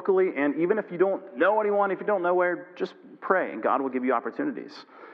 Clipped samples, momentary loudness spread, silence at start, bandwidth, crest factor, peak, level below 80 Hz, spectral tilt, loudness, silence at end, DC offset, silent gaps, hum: under 0.1%; 12 LU; 0 s; 6 kHz; 20 dB; -6 dBFS; -90 dBFS; -8 dB/octave; -26 LUFS; 0 s; under 0.1%; none; none